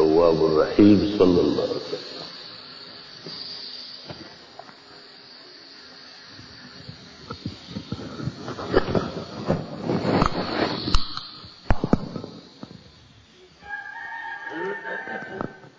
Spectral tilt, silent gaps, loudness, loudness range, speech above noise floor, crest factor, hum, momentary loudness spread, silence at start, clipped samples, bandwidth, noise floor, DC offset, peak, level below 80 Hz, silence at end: -6.5 dB/octave; none; -24 LUFS; 17 LU; 33 dB; 22 dB; none; 24 LU; 0 s; under 0.1%; 8 kHz; -51 dBFS; under 0.1%; -4 dBFS; -38 dBFS; 0.1 s